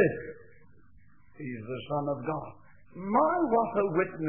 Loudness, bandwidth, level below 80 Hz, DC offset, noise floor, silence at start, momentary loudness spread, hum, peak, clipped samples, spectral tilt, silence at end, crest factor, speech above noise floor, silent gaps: -30 LUFS; 3.4 kHz; -64 dBFS; 0.2%; -61 dBFS; 0 s; 18 LU; none; -12 dBFS; under 0.1%; -11 dB/octave; 0 s; 20 dB; 32 dB; none